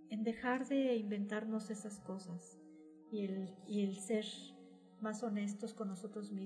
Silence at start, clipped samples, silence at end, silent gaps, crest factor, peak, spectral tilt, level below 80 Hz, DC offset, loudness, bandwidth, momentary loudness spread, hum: 0 s; under 0.1%; 0 s; none; 18 dB; -22 dBFS; -5.5 dB/octave; -82 dBFS; under 0.1%; -41 LUFS; 11 kHz; 19 LU; none